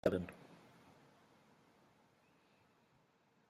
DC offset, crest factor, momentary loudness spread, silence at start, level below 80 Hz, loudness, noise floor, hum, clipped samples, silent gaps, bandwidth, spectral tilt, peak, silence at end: under 0.1%; 30 dB; 27 LU; 0.05 s; -74 dBFS; -42 LUFS; -75 dBFS; none; under 0.1%; none; 14 kHz; -7.5 dB/octave; -18 dBFS; 2.95 s